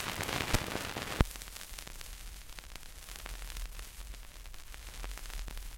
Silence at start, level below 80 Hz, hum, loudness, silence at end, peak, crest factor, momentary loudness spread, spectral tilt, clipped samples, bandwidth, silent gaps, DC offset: 0 s; -42 dBFS; none; -40 LUFS; 0 s; -4 dBFS; 36 dB; 15 LU; -3.5 dB/octave; under 0.1%; 17 kHz; none; under 0.1%